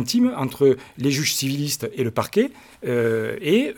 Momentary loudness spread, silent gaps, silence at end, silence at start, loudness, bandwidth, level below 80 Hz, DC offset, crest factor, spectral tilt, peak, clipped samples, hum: 6 LU; none; 0 s; 0 s; -22 LUFS; 19 kHz; -60 dBFS; under 0.1%; 16 dB; -4.5 dB/octave; -4 dBFS; under 0.1%; none